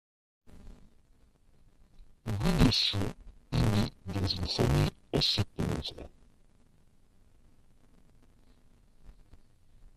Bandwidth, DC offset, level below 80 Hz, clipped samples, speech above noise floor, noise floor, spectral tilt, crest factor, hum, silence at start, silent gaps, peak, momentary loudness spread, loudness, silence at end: 14 kHz; under 0.1%; -44 dBFS; under 0.1%; 33 dB; -62 dBFS; -5.5 dB/octave; 24 dB; none; 0.5 s; none; -10 dBFS; 15 LU; -30 LUFS; 0.1 s